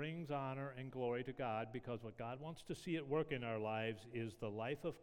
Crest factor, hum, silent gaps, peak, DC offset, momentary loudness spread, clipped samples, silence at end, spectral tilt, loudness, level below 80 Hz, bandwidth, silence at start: 18 dB; none; none; -26 dBFS; under 0.1%; 8 LU; under 0.1%; 0 s; -7 dB/octave; -45 LUFS; -70 dBFS; 17 kHz; 0 s